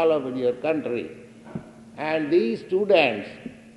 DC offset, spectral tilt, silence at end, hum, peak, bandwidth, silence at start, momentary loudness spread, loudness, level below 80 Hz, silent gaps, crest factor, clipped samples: under 0.1%; -6.5 dB/octave; 0.05 s; none; -4 dBFS; 11 kHz; 0 s; 20 LU; -23 LUFS; -66 dBFS; none; 20 dB; under 0.1%